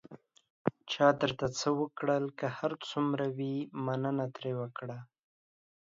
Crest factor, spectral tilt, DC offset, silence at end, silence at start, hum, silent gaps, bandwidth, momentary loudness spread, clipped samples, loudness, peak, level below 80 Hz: 22 dB; -5.5 dB/octave; under 0.1%; 0.9 s; 0.1 s; none; 0.50-0.65 s; 7.6 kHz; 10 LU; under 0.1%; -33 LUFS; -12 dBFS; -70 dBFS